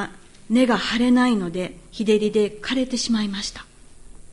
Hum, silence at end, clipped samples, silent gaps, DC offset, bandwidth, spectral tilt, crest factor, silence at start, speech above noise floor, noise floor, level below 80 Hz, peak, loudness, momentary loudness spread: none; 0 s; under 0.1%; none; under 0.1%; 11.5 kHz; -4.5 dB/octave; 16 dB; 0 s; 22 dB; -43 dBFS; -48 dBFS; -6 dBFS; -21 LUFS; 12 LU